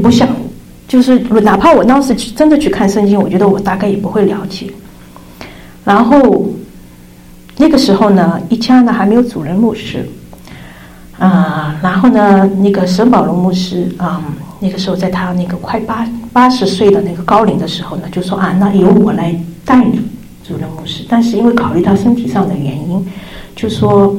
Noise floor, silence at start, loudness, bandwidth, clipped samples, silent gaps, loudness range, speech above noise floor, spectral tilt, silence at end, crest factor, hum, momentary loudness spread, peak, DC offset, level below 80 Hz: -36 dBFS; 0 s; -11 LUFS; 15.5 kHz; under 0.1%; none; 4 LU; 26 dB; -7 dB/octave; 0 s; 10 dB; none; 14 LU; 0 dBFS; under 0.1%; -38 dBFS